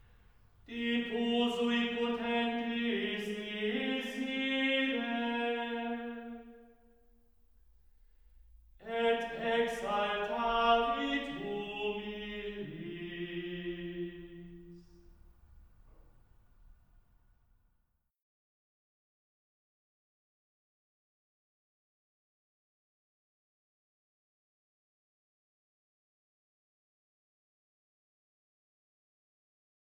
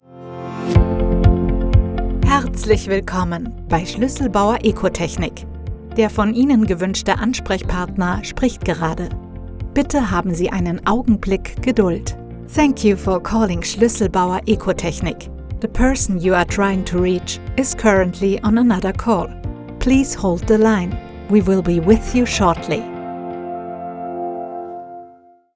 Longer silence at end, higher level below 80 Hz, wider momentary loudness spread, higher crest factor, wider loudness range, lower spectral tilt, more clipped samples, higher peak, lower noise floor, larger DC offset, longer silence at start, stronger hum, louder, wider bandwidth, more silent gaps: first, 13.25 s vs 0.45 s; second, -62 dBFS vs -26 dBFS; about the same, 13 LU vs 13 LU; about the same, 22 dB vs 18 dB; first, 12 LU vs 3 LU; about the same, -5 dB/octave vs -6 dB/octave; neither; second, -16 dBFS vs 0 dBFS; first, -78 dBFS vs -47 dBFS; neither; first, 0.65 s vs 0.1 s; neither; second, -34 LUFS vs -18 LUFS; first, over 20 kHz vs 8 kHz; neither